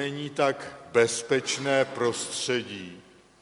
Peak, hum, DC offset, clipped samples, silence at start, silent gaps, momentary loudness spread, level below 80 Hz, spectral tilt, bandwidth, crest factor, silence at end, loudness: -6 dBFS; none; under 0.1%; under 0.1%; 0 s; none; 13 LU; -70 dBFS; -3 dB/octave; 11.5 kHz; 22 dB; 0.4 s; -27 LUFS